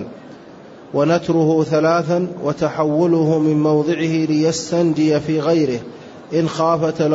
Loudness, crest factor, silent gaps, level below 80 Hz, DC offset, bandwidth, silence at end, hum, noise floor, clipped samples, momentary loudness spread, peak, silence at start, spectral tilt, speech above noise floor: -17 LUFS; 12 dB; none; -56 dBFS; under 0.1%; 8 kHz; 0 s; none; -39 dBFS; under 0.1%; 7 LU; -4 dBFS; 0 s; -6.5 dB/octave; 23 dB